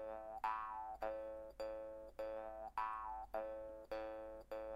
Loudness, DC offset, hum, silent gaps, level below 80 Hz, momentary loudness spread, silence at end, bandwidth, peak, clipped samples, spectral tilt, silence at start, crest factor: -48 LUFS; under 0.1%; none; none; -66 dBFS; 7 LU; 0 s; 16 kHz; -30 dBFS; under 0.1%; -5.5 dB/octave; 0 s; 18 dB